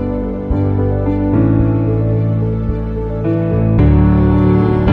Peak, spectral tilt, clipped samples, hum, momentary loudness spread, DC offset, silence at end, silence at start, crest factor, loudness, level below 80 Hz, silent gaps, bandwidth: 0 dBFS; -11.5 dB/octave; under 0.1%; none; 8 LU; under 0.1%; 0 s; 0 s; 12 dB; -14 LUFS; -22 dBFS; none; 4.3 kHz